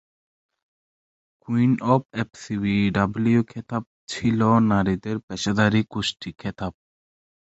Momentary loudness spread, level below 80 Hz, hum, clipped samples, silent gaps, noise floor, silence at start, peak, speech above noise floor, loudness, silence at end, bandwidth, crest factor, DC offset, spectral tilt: 12 LU; -50 dBFS; none; under 0.1%; 2.05-2.09 s, 3.87-4.07 s, 5.23-5.28 s; under -90 dBFS; 1.5 s; -4 dBFS; over 68 dB; -23 LUFS; 0.85 s; 8.2 kHz; 20 dB; under 0.1%; -6.5 dB/octave